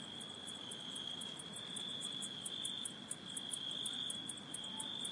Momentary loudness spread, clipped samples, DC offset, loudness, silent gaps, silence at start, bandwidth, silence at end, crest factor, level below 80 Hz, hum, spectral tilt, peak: 6 LU; under 0.1%; under 0.1%; -43 LUFS; none; 0 s; 11.5 kHz; 0 s; 20 dB; -82 dBFS; none; -1 dB/octave; -26 dBFS